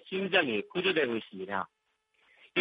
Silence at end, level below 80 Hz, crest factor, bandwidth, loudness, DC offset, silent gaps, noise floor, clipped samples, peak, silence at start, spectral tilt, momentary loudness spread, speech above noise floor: 0 s; -76 dBFS; 22 dB; 5.2 kHz; -30 LUFS; under 0.1%; none; -75 dBFS; under 0.1%; -10 dBFS; 0.05 s; -7.5 dB/octave; 10 LU; 44 dB